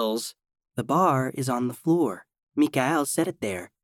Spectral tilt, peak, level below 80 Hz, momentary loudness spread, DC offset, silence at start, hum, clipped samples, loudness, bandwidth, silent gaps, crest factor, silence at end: -5.5 dB/octave; -8 dBFS; -70 dBFS; 12 LU; under 0.1%; 0 s; none; under 0.1%; -25 LUFS; 17 kHz; 2.43-2.47 s; 18 dB; 0.2 s